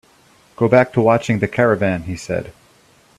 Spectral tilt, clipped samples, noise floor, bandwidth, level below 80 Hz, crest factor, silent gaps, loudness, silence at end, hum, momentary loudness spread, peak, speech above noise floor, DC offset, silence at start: -7 dB/octave; under 0.1%; -52 dBFS; 13 kHz; -50 dBFS; 18 dB; none; -17 LUFS; 0.7 s; none; 11 LU; 0 dBFS; 36 dB; under 0.1%; 0.6 s